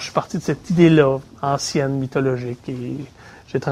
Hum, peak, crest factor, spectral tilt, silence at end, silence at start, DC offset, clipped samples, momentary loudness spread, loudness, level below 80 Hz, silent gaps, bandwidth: none; -2 dBFS; 18 dB; -6.5 dB/octave; 0 s; 0 s; under 0.1%; under 0.1%; 15 LU; -20 LUFS; -50 dBFS; none; 13.5 kHz